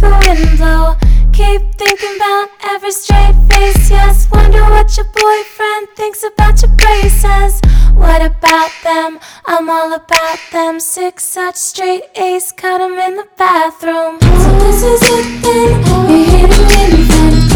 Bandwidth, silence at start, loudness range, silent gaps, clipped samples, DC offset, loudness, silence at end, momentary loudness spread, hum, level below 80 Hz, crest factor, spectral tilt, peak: 17 kHz; 0 s; 5 LU; none; 3%; under 0.1%; -10 LUFS; 0 s; 8 LU; none; -10 dBFS; 8 dB; -5 dB/octave; 0 dBFS